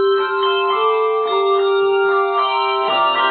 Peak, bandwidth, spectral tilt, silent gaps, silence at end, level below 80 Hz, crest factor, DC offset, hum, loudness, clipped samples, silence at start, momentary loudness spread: -4 dBFS; 4.6 kHz; -6.5 dB/octave; none; 0 s; -78 dBFS; 12 dB; under 0.1%; none; -16 LUFS; under 0.1%; 0 s; 2 LU